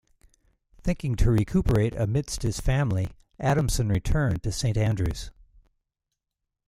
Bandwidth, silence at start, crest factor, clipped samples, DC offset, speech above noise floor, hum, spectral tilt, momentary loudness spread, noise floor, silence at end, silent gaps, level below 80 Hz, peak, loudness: 15 kHz; 0.85 s; 16 dB; under 0.1%; under 0.1%; 61 dB; none; -6 dB/octave; 7 LU; -85 dBFS; 1.35 s; none; -34 dBFS; -10 dBFS; -26 LUFS